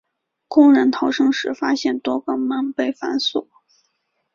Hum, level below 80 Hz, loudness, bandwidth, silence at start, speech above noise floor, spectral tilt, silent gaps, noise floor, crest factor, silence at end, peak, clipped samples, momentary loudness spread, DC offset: none; -64 dBFS; -19 LUFS; 7.2 kHz; 0.5 s; 52 dB; -3.5 dB/octave; none; -70 dBFS; 18 dB; 0.9 s; -2 dBFS; under 0.1%; 10 LU; under 0.1%